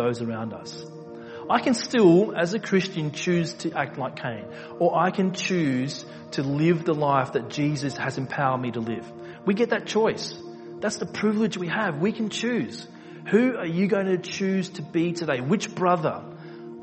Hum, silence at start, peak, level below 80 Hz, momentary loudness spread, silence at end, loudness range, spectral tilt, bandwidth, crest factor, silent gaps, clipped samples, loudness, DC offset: none; 0 s; -6 dBFS; -66 dBFS; 15 LU; 0 s; 3 LU; -6 dB/octave; 8.4 kHz; 20 dB; none; under 0.1%; -25 LUFS; under 0.1%